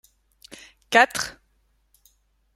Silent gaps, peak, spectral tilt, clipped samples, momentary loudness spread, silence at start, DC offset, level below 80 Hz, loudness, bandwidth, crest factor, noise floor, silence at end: none; -2 dBFS; -1.5 dB/octave; under 0.1%; 27 LU; 0.9 s; under 0.1%; -62 dBFS; -21 LUFS; 16.5 kHz; 26 dB; -66 dBFS; 1.25 s